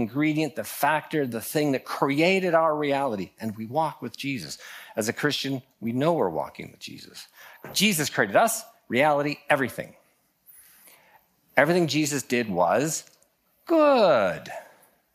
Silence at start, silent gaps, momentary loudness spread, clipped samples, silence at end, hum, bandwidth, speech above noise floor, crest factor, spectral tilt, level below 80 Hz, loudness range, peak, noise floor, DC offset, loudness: 0 s; none; 16 LU; under 0.1%; 0.5 s; none; 15.5 kHz; 41 dB; 22 dB; -4 dB/octave; -72 dBFS; 5 LU; -4 dBFS; -65 dBFS; under 0.1%; -24 LUFS